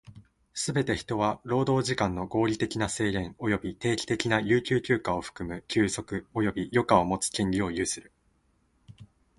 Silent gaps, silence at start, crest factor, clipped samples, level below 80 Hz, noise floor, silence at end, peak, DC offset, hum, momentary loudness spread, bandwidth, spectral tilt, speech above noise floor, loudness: none; 0.15 s; 22 dB; under 0.1%; -52 dBFS; -69 dBFS; 0.35 s; -6 dBFS; under 0.1%; none; 8 LU; 11.5 kHz; -5 dB/octave; 41 dB; -28 LUFS